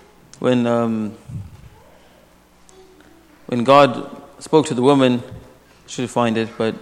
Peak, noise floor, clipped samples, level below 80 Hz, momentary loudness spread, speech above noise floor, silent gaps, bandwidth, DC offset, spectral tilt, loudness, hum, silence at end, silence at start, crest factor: 0 dBFS; -51 dBFS; under 0.1%; -54 dBFS; 22 LU; 34 dB; none; 13 kHz; under 0.1%; -6 dB/octave; -18 LUFS; 60 Hz at -45 dBFS; 0 s; 0.4 s; 20 dB